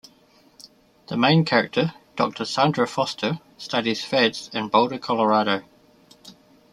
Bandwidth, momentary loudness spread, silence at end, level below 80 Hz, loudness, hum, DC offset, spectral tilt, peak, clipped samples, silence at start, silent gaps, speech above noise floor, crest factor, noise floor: 12.5 kHz; 9 LU; 0.4 s; -66 dBFS; -22 LUFS; none; under 0.1%; -5.5 dB/octave; -4 dBFS; under 0.1%; 0.65 s; none; 35 dB; 20 dB; -56 dBFS